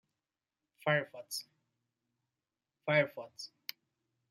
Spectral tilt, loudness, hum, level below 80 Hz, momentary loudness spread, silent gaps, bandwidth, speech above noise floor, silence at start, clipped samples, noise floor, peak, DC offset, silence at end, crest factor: -4.5 dB/octave; -35 LUFS; none; -88 dBFS; 16 LU; none; 16 kHz; over 55 dB; 0.85 s; under 0.1%; under -90 dBFS; -16 dBFS; under 0.1%; 0.85 s; 24 dB